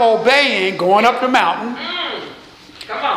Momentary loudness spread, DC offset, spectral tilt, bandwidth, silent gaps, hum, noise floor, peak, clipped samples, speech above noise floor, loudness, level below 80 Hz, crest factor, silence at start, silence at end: 16 LU; under 0.1%; -3.5 dB/octave; 15 kHz; none; none; -39 dBFS; 0 dBFS; under 0.1%; 25 dB; -15 LUFS; -60 dBFS; 16 dB; 0 s; 0 s